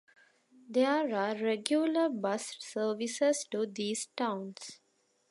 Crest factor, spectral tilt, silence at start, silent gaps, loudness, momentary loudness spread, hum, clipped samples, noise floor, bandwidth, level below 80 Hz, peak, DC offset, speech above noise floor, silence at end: 24 dB; -3.5 dB/octave; 0.7 s; none; -32 LUFS; 10 LU; none; under 0.1%; -74 dBFS; 11.5 kHz; -88 dBFS; -10 dBFS; under 0.1%; 42 dB; 0.55 s